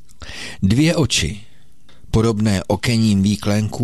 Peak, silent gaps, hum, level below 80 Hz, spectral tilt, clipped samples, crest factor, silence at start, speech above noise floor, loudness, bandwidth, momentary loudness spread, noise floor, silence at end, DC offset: -4 dBFS; none; none; -36 dBFS; -5.5 dB/octave; under 0.1%; 14 dB; 0.2 s; 35 dB; -18 LUFS; 13 kHz; 15 LU; -52 dBFS; 0 s; 2%